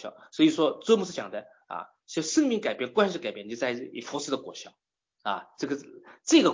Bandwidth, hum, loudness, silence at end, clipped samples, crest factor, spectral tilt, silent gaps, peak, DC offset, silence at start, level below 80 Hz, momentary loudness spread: 7.6 kHz; none; -28 LUFS; 0 s; under 0.1%; 20 dB; -3.5 dB/octave; none; -8 dBFS; under 0.1%; 0 s; -74 dBFS; 17 LU